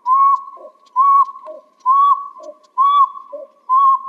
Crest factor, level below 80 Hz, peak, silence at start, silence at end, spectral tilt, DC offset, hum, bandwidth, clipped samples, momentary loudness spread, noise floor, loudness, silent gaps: 12 dB; under -90 dBFS; -4 dBFS; 0.05 s; 0 s; -0.5 dB/octave; under 0.1%; none; 3.7 kHz; under 0.1%; 21 LU; -38 dBFS; -14 LUFS; none